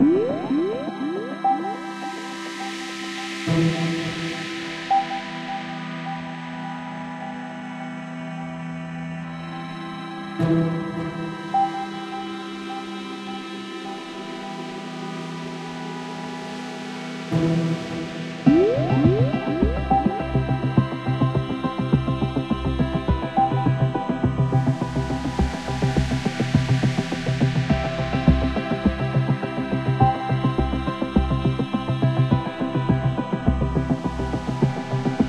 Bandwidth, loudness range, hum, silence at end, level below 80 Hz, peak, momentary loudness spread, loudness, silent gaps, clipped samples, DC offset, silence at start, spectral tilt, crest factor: 11 kHz; 11 LU; none; 0 s; -36 dBFS; -4 dBFS; 12 LU; -24 LUFS; none; under 0.1%; under 0.1%; 0 s; -7 dB/octave; 20 dB